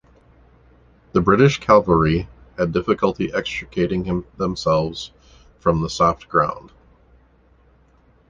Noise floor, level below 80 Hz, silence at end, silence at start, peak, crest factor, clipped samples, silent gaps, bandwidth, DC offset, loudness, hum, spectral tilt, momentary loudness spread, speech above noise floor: -55 dBFS; -40 dBFS; 1.7 s; 1.15 s; -2 dBFS; 20 dB; under 0.1%; none; 9.4 kHz; under 0.1%; -19 LUFS; none; -6.5 dB/octave; 11 LU; 36 dB